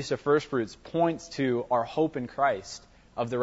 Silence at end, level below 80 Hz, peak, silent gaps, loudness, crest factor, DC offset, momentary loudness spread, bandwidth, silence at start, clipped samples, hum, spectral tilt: 0 s; -60 dBFS; -12 dBFS; none; -28 LUFS; 16 dB; under 0.1%; 9 LU; 8 kHz; 0 s; under 0.1%; none; -6 dB/octave